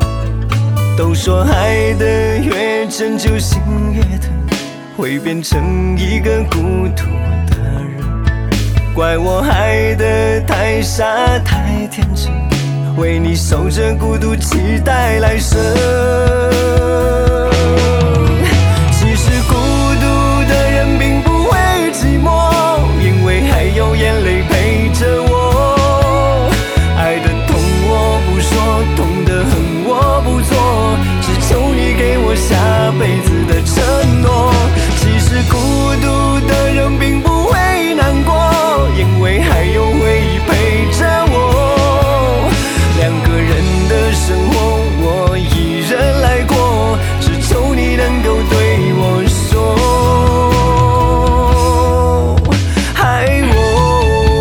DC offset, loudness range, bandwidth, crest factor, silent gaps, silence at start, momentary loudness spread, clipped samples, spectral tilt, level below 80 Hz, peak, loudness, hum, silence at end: under 0.1%; 3 LU; 19.5 kHz; 12 dB; none; 0 s; 4 LU; under 0.1%; -5.5 dB/octave; -16 dBFS; 0 dBFS; -12 LUFS; none; 0 s